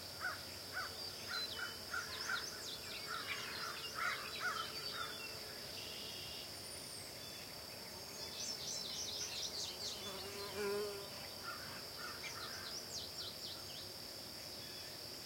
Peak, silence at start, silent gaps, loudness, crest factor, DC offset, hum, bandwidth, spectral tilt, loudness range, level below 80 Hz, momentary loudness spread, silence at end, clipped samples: -28 dBFS; 0 s; none; -44 LUFS; 18 dB; under 0.1%; none; 16.5 kHz; -1.5 dB/octave; 4 LU; -72 dBFS; 6 LU; 0 s; under 0.1%